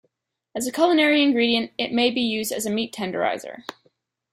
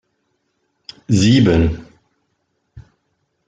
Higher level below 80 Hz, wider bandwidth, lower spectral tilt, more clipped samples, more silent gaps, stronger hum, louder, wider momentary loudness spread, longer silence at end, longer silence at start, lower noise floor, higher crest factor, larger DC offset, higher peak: second, -66 dBFS vs -36 dBFS; first, 15.5 kHz vs 9.4 kHz; second, -3 dB/octave vs -6 dB/octave; neither; neither; neither; second, -22 LUFS vs -14 LUFS; second, 17 LU vs 26 LU; about the same, 0.6 s vs 0.65 s; second, 0.55 s vs 1.1 s; about the same, -72 dBFS vs -69 dBFS; about the same, 18 dB vs 18 dB; neither; second, -6 dBFS vs -2 dBFS